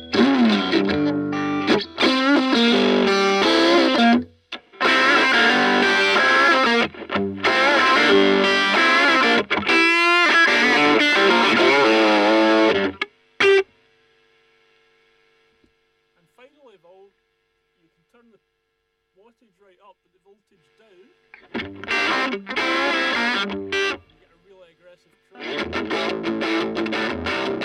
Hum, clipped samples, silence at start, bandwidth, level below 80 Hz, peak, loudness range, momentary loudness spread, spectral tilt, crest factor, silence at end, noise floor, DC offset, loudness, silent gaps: none; under 0.1%; 0 s; 15 kHz; -58 dBFS; -4 dBFS; 11 LU; 11 LU; -3.5 dB/octave; 16 dB; 0 s; -73 dBFS; under 0.1%; -17 LUFS; none